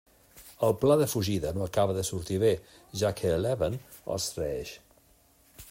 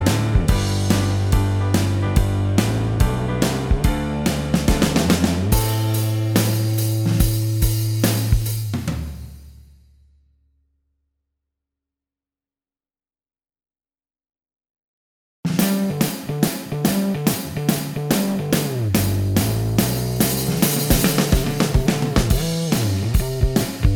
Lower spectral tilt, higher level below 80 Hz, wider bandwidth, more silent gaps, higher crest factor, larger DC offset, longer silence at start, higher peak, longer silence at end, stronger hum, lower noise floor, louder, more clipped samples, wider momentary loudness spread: about the same, -5.5 dB/octave vs -5.5 dB/octave; second, -54 dBFS vs -28 dBFS; second, 16.5 kHz vs over 20 kHz; second, none vs 14.70-14.74 s, 14.84-15.43 s; about the same, 18 dB vs 20 dB; neither; first, 0.35 s vs 0 s; second, -12 dBFS vs 0 dBFS; about the same, 0.05 s vs 0 s; neither; second, -62 dBFS vs under -90 dBFS; second, -29 LUFS vs -20 LUFS; neither; first, 13 LU vs 4 LU